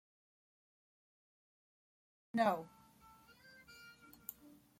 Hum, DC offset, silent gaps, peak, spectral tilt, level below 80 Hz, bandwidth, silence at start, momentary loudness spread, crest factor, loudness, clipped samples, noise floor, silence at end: none; under 0.1%; none; -22 dBFS; -5.5 dB/octave; -82 dBFS; 16.5 kHz; 2.35 s; 26 LU; 24 dB; -40 LUFS; under 0.1%; -65 dBFS; 0.9 s